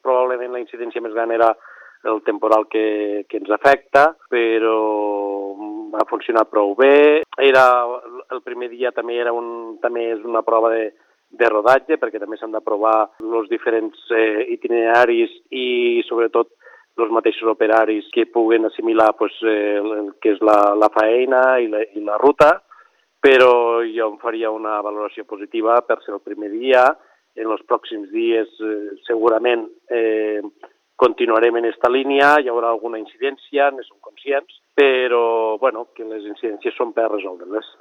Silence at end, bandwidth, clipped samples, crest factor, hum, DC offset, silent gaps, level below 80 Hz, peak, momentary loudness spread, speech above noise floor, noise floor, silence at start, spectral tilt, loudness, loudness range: 0.15 s; 9.4 kHz; under 0.1%; 18 dB; none; under 0.1%; none; -64 dBFS; 0 dBFS; 14 LU; 35 dB; -53 dBFS; 0.05 s; -5 dB/octave; -18 LUFS; 4 LU